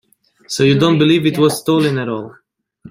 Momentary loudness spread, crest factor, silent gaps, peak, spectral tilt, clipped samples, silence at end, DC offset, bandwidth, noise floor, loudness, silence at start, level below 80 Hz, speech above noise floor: 13 LU; 14 dB; none; -2 dBFS; -5.5 dB/octave; under 0.1%; 0 s; under 0.1%; 16 kHz; -43 dBFS; -14 LUFS; 0.5 s; -54 dBFS; 29 dB